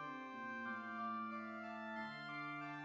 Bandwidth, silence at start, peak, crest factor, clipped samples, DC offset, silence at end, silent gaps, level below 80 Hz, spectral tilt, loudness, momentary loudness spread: 7.8 kHz; 0 s; -34 dBFS; 12 dB; under 0.1%; under 0.1%; 0 s; none; under -90 dBFS; -6 dB/octave; -47 LUFS; 4 LU